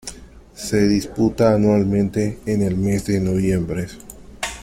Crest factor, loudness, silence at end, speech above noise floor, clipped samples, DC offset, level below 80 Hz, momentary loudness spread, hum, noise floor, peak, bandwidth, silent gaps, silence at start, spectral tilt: 16 dB; -19 LUFS; 0 s; 23 dB; under 0.1%; under 0.1%; -40 dBFS; 13 LU; none; -41 dBFS; -4 dBFS; 15.5 kHz; none; 0.05 s; -6.5 dB/octave